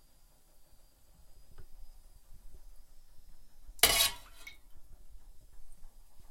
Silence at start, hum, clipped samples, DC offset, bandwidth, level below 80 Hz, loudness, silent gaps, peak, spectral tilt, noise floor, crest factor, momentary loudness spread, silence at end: 0 s; none; under 0.1%; under 0.1%; 16.5 kHz; -54 dBFS; -27 LUFS; none; -8 dBFS; 0.5 dB/octave; -61 dBFS; 32 dB; 27 LU; 0 s